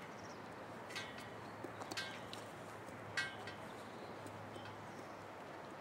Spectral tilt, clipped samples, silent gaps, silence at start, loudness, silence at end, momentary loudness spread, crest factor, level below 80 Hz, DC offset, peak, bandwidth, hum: -3.5 dB/octave; under 0.1%; none; 0 s; -48 LUFS; 0 s; 8 LU; 22 dB; -80 dBFS; under 0.1%; -26 dBFS; 16 kHz; none